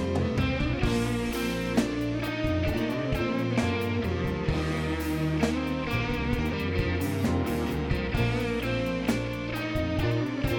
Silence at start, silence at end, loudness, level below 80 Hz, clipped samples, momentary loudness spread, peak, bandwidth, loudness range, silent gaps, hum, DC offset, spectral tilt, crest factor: 0 s; 0 s; -28 LUFS; -38 dBFS; under 0.1%; 2 LU; -10 dBFS; 17.5 kHz; 0 LU; none; none; under 0.1%; -6.5 dB/octave; 16 dB